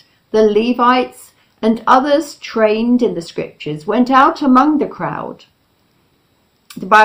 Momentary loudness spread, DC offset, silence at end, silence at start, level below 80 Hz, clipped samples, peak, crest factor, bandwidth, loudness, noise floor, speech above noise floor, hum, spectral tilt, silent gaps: 14 LU; under 0.1%; 0 s; 0.35 s; -52 dBFS; 0.2%; 0 dBFS; 14 dB; 16 kHz; -14 LUFS; -58 dBFS; 45 dB; none; -5.5 dB/octave; none